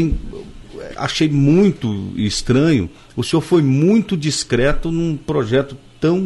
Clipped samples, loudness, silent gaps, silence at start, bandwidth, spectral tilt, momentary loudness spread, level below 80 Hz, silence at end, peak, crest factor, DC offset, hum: under 0.1%; -17 LUFS; none; 0 s; 11.5 kHz; -6 dB/octave; 14 LU; -32 dBFS; 0 s; -4 dBFS; 12 dB; under 0.1%; none